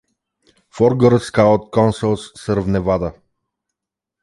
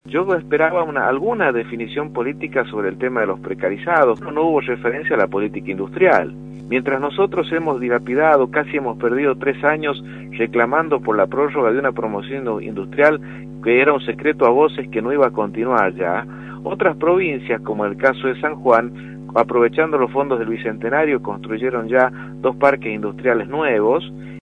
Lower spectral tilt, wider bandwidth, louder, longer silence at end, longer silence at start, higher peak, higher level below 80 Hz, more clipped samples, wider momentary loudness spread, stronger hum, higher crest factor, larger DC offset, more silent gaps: about the same, -7.5 dB/octave vs -8 dB/octave; first, 11.5 kHz vs 6.8 kHz; about the same, -17 LUFS vs -18 LUFS; first, 1.1 s vs 0 s; first, 0.75 s vs 0.05 s; about the same, -2 dBFS vs 0 dBFS; first, -42 dBFS vs -50 dBFS; neither; about the same, 8 LU vs 9 LU; neither; about the same, 16 dB vs 18 dB; neither; neither